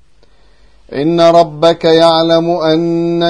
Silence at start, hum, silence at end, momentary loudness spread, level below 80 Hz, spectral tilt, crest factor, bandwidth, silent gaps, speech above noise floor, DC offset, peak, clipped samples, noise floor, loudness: 0.9 s; none; 0 s; 7 LU; -50 dBFS; -6 dB/octave; 12 dB; 10.5 kHz; none; 39 dB; 0.6%; 0 dBFS; 0.4%; -49 dBFS; -10 LUFS